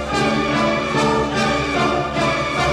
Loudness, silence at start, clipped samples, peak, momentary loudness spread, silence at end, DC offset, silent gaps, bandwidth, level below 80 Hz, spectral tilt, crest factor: -18 LUFS; 0 s; under 0.1%; -6 dBFS; 1 LU; 0 s; under 0.1%; none; 13.5 kHz; -36 dBFS; -5 dB/octave; 14 dB